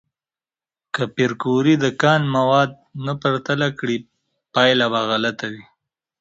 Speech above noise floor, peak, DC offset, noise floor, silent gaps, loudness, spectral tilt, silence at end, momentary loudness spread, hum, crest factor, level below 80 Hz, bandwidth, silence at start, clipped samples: over 71 dB; 0 dBFS; under 0.1%; under -90 dBFS; none; -19 LUFS; -5.5 dB/octave; 0.6 s; 12 LU; none; 20 dB; -60 dBFS; 8 kHz; 0.95 s; under 0.1%